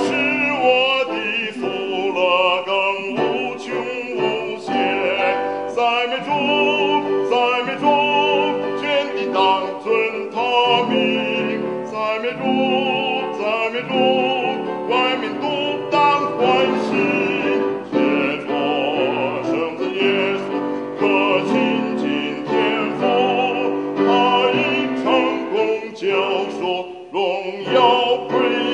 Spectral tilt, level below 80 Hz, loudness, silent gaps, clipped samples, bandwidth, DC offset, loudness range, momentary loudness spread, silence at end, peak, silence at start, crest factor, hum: -5 dB/octave; -70 dBFS; -19 LUFS; none; under 0.1%; 10 kHz; under 0.1%; 2 LU; 7 LU; 0 s; -2 dBFS; 0 s; 18 dB; none